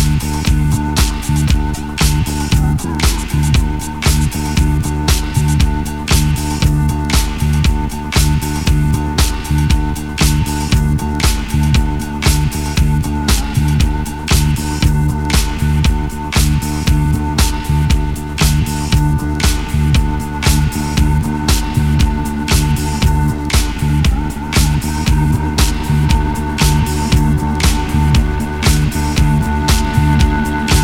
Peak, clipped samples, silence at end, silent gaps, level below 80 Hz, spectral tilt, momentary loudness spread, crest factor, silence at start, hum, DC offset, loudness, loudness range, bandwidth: 0 dBFS; under 0.1%; 0 s; none; -16 dBFS; -5 dB/octave; 3 LU; 14 dB; 0 s; none; under 0.1%; -15 LUFS; 1 LU; 16.5 kHz